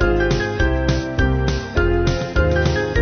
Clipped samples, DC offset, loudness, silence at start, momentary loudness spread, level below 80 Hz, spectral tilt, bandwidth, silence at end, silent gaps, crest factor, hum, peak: under 0.1%; 0.2%; -19 LUFS; 0 s; 3 LU; -22 dBFS; -6.5 dB/octave; 6.6 kHz; 0 s; none; 14 dB; none; -4 dBFS